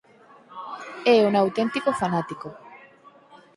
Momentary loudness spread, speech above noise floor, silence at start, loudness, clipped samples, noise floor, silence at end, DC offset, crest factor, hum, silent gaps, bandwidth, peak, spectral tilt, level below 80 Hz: 22 LU; 31 dB; 0.5 s; -22 LUFS; under 0.1%; -52 dBFS; 0.2 s; under 0.1%; 20 dB; none; none; 11.5 kHz; -6 dBFS; -6 dB/octave; -66 dBFS